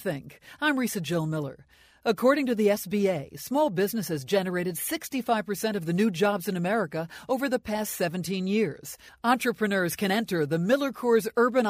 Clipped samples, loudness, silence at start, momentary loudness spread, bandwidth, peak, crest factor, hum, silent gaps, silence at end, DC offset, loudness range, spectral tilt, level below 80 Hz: under 0.1%; -27 LUFS; 0 s; 7 LU; 16 kHz; -8 dBFS; 18 dB; none; none; 0 s; under 0.1%; 2 LU; -5 dB/octave; -64 dBFS